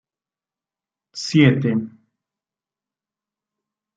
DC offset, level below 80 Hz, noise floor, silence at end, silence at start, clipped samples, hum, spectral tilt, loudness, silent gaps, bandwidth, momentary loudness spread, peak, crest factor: under 0.1%; -64 dBFS; under -90 dBFS; 2.1 s; 1.15 s; under 0.1%; none; -6.5 dB/octave; -18 LUFS; none; 9 kHz; 22 LU; -2 dBFS; 22 dB